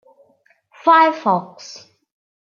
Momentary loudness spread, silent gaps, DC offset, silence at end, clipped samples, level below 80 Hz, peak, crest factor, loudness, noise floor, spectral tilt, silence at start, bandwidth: 24 LU; none; under 0.1%; 0.8 s; under 0.1%; -78 dBFS; -2 dBFS; 18 dB; -15 LUFS; -59 dBFS; -5 dB/octave; 0.85 s; 7.2 kHz